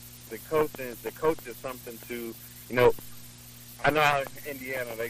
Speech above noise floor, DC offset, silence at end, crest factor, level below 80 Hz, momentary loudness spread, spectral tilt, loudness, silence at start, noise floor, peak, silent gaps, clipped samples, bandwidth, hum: 19 dB; under 0.1%; 0 s; 22 dB; -54 dBFS; 20 LU; -4.5 dB/octave; -29 LUFS; 0 s; -47 dBFS; -8 dBFS; none; under 0.1%; 15.5 kHz; 60 Hz at -50 dBFS